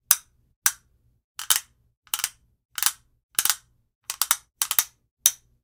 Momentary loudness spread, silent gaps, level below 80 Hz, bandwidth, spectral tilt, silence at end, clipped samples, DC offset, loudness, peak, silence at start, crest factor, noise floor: 14 LU; 0.56-0.62 s, 1.24-1.35 s, 1.97-2.02 s, 2.65-2.69 s, 3.23-3.29 s, 3.95-4.01 s, 5.11-5.17 s; -66 dBFS; 19.5 kHz; 3.5 dB/octave; 0.3 s; under 0.1%; under 0.1%; -24 LUFS; 0 dBFS; 0.1 s; 28 dB; -62 dBFS